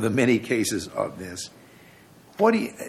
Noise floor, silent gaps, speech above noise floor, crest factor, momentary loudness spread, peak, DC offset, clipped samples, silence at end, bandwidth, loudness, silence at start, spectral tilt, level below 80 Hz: -51 dBFS; none; 27 dB; 20 dB; 15 LU; -6 dBFS; under 0.1%; under 0.1%; 0 s; 15.5 kHz; -24 LUFS; 0 s; -5 dB/octave; -62 dBFS